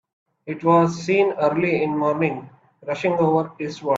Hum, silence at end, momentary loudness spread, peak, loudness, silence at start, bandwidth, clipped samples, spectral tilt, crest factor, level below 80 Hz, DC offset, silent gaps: none; 0 s; 15 LU; -6 dBFS; -21 LUFS; 0.45 s; 7.8 kHz; under 0.1%; -7 dB/octave; 16 dB; -64 dBFS; under 0.1%; none